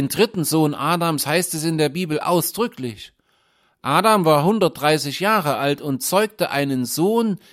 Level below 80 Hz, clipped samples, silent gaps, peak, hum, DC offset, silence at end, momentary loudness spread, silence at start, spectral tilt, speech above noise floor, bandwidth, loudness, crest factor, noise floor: -62 dBFS; under 0.1%; none; -2 dBFS; none; under 0.1%; 0.15 s; 7 LU; 0 s; -4.5 dB/octave; 43 dB; 16.5 kHz; -19 LUFS; 18 dB; -63 dBFS